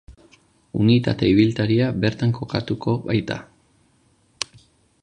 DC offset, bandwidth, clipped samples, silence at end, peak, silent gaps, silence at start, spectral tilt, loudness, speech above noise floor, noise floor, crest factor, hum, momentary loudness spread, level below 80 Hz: under 0.1%; 10.5 kHz; under 0.1%; 1.6 s; -2 dBFS; none; 0.1 s; -7 dB/octave; -21 LUFS; 41 dB; -61 dBFS; 20 dB; none; 14 LU; -48 dBFS